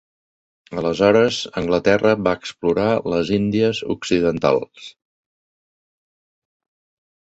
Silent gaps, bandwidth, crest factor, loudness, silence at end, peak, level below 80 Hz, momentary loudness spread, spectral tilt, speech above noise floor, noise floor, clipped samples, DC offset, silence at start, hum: none; 8.2 kHz; 20 dB; -19 LUFS; 2.45 s; -2 dBFS; -50 dBFS; 9 LU; -5.5 dB/octave; over 72 dB; under -90 dBFS; under 0.1%; under 0.1%; 0.7 s; none